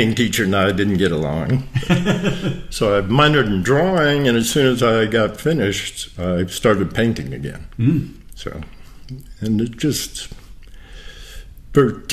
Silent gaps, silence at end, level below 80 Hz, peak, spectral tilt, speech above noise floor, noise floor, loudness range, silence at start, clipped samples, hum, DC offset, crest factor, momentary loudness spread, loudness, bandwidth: none; 0 s; -38 dBFS; -2 dBFS; -5.5 dB/octave; 20 dB; -38 dBFS; 8 LU; 0 s; under 0.1%; none; 0.1%; 18 dB; 17 LU; -18 LUFS; 15 kHz